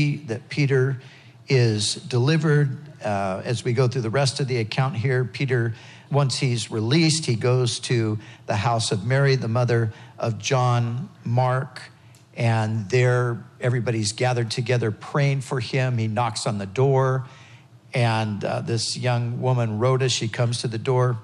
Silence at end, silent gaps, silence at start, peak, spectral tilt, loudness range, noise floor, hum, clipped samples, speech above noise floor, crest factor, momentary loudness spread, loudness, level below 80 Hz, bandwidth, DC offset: 0 s; none; 0 s; -8 dBFS; -5.5 dB/octave; 2 LU; -48 dBFS; none; under 0.1%; 26 dB; 14 dB; 8 LU; -23 LUFS; -70 dBFS; 11 kHz; under 0.1%